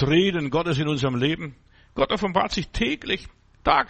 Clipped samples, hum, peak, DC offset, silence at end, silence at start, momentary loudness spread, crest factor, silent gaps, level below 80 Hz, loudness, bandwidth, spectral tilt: under 0.1%; none; -6 dBFS; under 0.1%; 0.05 s; 0 s; 8 LU; 18 dB; none; -42 dBFS; -24 LUFS; 8.4 kHz; -6 dB/octave